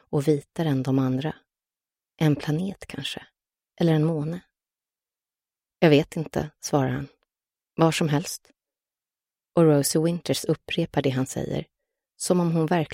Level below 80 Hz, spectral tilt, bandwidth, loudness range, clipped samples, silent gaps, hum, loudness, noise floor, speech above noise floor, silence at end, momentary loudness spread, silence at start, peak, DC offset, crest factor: -58 dBFS; -6 dB/octave; 16 kHz; 3 LU; under 0.1%; none; none; -25 LUFS; under -90 dBFS; over 67 dB; 0 s; 13 LU; 0.1 s; -6 dBFS; under 0.1%; 20 dB